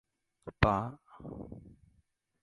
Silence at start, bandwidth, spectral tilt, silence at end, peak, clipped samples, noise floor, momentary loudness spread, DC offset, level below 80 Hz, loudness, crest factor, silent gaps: 0.45 s; 11 kHz; -7.5 dB/octave; 0.7 s; -10 dBFS; under 0.1%; -73 dBFS; 22 LU; under 0.1%; -46 dBFS; -31 LUFS; 26 dB; none